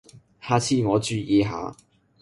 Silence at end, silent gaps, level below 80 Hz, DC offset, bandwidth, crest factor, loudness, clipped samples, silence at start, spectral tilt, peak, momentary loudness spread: 0.5 s; none; -52 dBFS; under 0.1%; 11.5 kHz; 18 dB; -23 LUFS; under 0.1%; 0.15 s; -5.5 dB/octave; -6 dBFS; 14 LU